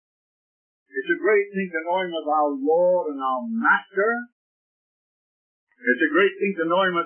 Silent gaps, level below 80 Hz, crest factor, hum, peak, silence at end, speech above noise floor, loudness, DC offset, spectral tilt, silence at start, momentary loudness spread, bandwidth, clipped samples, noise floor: 4.32-5.67 s; -84 dBFS; 18 dB; none; -6 dBFS; 0 s; over 68 dB; -22 LUFS; under 0.1%; -9.5 dB/octave; 0.95 s; 7 LU; 3.4 kHz; under 0.1%; under -90 dBFS